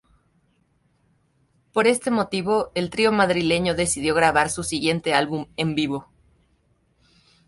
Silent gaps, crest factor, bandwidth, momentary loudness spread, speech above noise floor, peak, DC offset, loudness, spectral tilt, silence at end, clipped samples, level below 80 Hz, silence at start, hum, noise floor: none; 20 dB; 12 kHz; 7 LU; 44 dB; -4 dBFS; under 0.1%; -22 LUFS; -4 dB/octave; 1.45 s; under 0.1%; -52 dBFS; 1.75 s; none; -65 dBFS